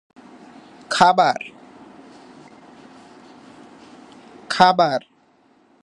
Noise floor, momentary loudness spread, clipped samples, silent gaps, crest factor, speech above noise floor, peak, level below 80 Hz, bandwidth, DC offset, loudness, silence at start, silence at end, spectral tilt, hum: -57 dBFS; 14 LU; under 0.1%; none; 22 dB; 42 dB; 0 dBFS; -64 dBFS; 11.5 kHz; under 0.1%; -17 LUFS; 0.9 s; 0.85 s; -4 dB/octave; none